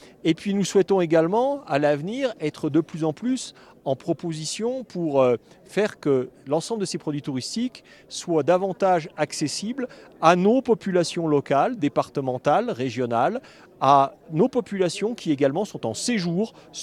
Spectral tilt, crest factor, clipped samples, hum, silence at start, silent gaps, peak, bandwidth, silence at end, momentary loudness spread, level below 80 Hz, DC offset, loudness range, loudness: -5.5 dB/octave; 22 dB; under 0.1%; none; 0.25 s; none; -2 dBFS; 13.5 kHz; 0 s; 9 LU; -66 dBFS; under 0.1%; 4 LU; -24 LUFS